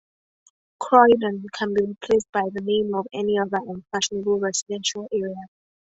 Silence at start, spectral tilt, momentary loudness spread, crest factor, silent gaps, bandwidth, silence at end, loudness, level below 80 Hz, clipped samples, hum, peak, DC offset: 0.8 s; -3.5 dB/octave; 12 LU; 22 dB; 2.29-2.33 s, 4.62-4.66 s; 8.2 kHz; 0.5 s; -22 LUFS; -62 dBFS; under 0.1%; none; -2 dBFS; under 0.1%